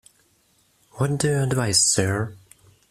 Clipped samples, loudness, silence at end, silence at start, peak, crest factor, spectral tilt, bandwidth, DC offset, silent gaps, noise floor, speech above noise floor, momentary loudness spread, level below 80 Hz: under 0.1%; -21 LUFS; 0.55 s; 0.95 s; -4 dBFS; 20 dB; -3.5 dB/octave; 15 kHz; under 0.1%; none; -63 dBFS; 41 dB; 11 LU; -54 dBFS